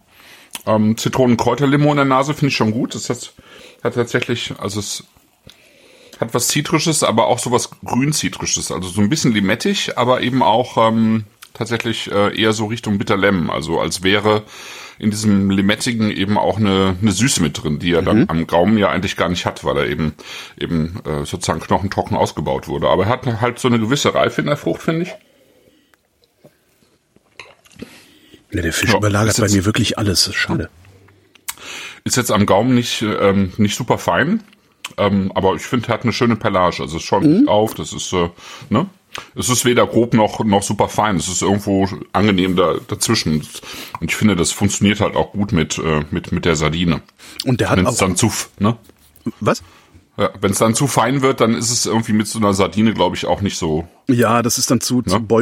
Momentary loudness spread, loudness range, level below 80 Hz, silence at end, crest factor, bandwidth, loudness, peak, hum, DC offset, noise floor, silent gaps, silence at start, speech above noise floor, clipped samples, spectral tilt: 9 LU; 4 LU; -44 dBFS; 0 s; 16 dB; 16.5 kHz; -17 LUFS; -2 dBFS; none; under 0.1%; -59 dBFS; none; 0.55 s; 43 dB; under 0.1%; -4.5 dB/octave